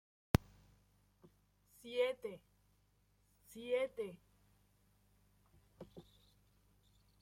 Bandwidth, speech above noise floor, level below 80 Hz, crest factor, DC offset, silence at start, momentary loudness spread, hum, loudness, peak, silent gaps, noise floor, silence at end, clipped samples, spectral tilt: 16.5 kHz; 34 dB; -58 dBFS; 34 dB; under 0.1%; 0.35 s; 22 LU; 50 Hz at -75 dBFS; -41 LUFS; -12 dBFS; none; -75 dBFS; 1.2 s; under 0.1%; -6 dB/octave